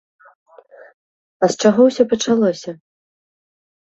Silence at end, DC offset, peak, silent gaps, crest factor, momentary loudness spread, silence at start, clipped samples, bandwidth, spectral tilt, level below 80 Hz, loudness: 1.25 s; under 0.1%; -2 dBFS; none; 18 dB; 12 LU; 1.4 s; under 0.1%; 8.2 kHz; -5 dB/octave; -62 dBFS; -16 LUFS